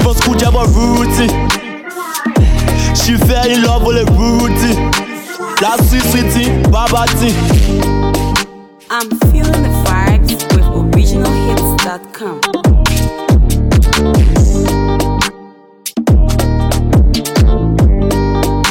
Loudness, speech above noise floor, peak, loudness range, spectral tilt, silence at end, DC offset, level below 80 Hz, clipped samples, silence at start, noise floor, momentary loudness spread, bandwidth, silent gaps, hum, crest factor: -12 LUFS; 26 dB; 0 dBFS; 1 LU; -5.5 dB/octave; 0 s; under 0.1%; -14 dBFS; under 0.1%; 0 s; -37 dBFS; 7 LU; 19 kHz; none; none; 10 dB